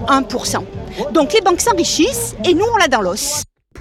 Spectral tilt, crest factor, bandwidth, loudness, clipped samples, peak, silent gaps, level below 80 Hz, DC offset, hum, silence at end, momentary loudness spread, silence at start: -3 dB/octave; 12 dB; 16.5 kHz; -15 LUFS; under 0.1%; -4 dBFS; none; -38 dBFS; under 0.1%; none; 0 s; 10 LU; 0 s